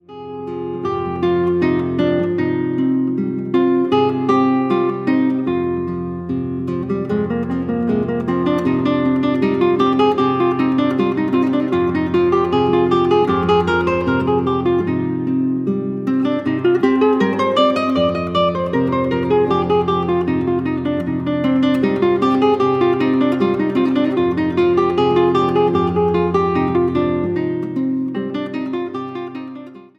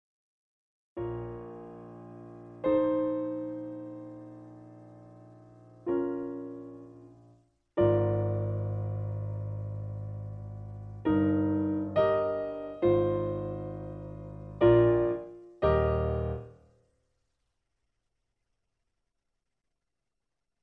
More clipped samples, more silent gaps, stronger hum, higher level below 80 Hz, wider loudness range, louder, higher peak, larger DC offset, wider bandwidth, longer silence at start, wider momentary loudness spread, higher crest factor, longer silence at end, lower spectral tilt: neither; neither; neither; about the same, -48 dBFS vs -48 dBFS; second, 3 LU vs 10 LU; first, -17 LUFS vs -30 LUFS; first, -2 dBFS vs -10 dBFS; neither; first, 7.4 kHz vs 4.7 kHz; second, 0.1 s vs 0.95 s; second, 7 LU vs 21 LU; second, 14 dB vs 22 dB; second, 0.15 s vs 4.1 s; second, -8 dB/octave vs -11 dB/octave